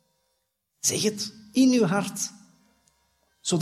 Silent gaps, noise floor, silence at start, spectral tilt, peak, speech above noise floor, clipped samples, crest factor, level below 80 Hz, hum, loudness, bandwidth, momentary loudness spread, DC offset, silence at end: none; -76 dBFS; 0.85 s; -4 dB/octave; -10 dBFS; 53 dB; under 0.1%; 18 dB; -74 dBFS; none; -25 LUFS; 14.5 kHz; 13 LU; under 0.1%; 0 s